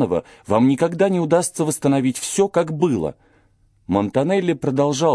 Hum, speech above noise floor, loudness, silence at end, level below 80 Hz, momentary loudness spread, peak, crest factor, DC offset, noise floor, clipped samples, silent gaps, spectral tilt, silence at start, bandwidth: none; 39 dB; -19 LUFS; 0 s; -54 dBFS; 5 LU; -4 dBFS; 16 dB; under 0.1%; -58 dBFS; under 0.1%; none; -5.5 dB/octave; 0 s; 11 kHz